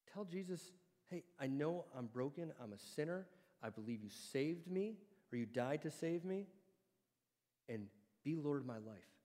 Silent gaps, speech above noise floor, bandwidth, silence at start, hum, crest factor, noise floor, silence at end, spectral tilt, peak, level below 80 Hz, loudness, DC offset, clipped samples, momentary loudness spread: none; over 45 dB; 16 kHz; 0.05 s; none; 20 dB; under -90 dBFS; 0.2 s; -6.5 dB/octave; -28 dBFS; under -90 dBFS; -46 LUFS; under 0.1%; under 0.1%; 11 LU